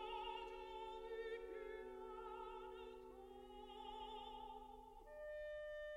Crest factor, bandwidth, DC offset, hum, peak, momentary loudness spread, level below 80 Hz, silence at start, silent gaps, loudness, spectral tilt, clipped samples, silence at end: 14 dB; 16 kHz; under 0.1%; 50 Hz at -75 dBFS; -38 dBFS; 9 LU; -68 dBFS; 0 s; none; -53 LUFS; -4.5 dB/octave; under 0.1%; 0 s